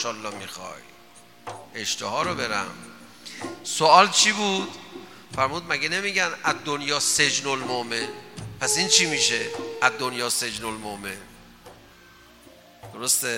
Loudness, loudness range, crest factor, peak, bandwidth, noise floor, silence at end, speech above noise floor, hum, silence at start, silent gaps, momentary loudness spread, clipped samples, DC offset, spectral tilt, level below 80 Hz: -22 LUFS; 9 LU; 26 dB; 0 dBFS; 17 kHz; -51 dBFS; 0 s; 27 dB; none; 0 s; none; 23 LU; under 0.1%; 0.2%; -1.5 dB/octave; -62 dBFS